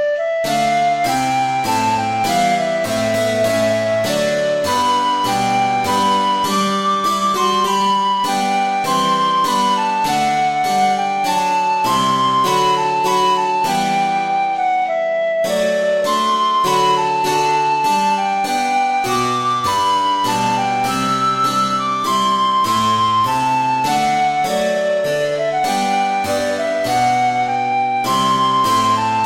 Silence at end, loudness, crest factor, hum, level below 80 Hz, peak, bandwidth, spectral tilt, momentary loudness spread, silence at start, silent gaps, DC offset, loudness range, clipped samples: 0 s; -16 LUFS; 12 dB; none; -52 dBFS; -4 dBFS; 16.5 kHz; -3.5 dB/octave; 3 LU; 0 s; none; under 0.1%; 1 LU; under 0.1%